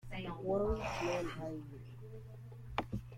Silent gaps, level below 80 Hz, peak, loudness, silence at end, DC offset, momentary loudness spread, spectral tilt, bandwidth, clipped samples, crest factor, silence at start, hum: none; -52 dBFS; -18 dBFS; -39 LUFS; 0 s; under 0.1%; 16 LU; -6 dB/octave; 16.5 kHz; under 0.1%; 22 dB; 0.05 s; none